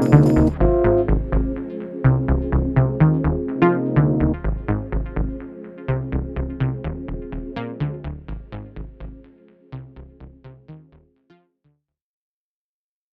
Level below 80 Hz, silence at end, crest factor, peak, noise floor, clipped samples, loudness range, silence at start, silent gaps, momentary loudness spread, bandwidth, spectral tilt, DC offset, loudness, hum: -28 dBFS; 2.35 s; 20 dB; 0 dBFS; under -90 dBFS; under 0.1%; 20 LU; 0 s; none; 20 LU; 7.6 kHz; -10 dB/octave; under 0.1%; -21 LUFS; none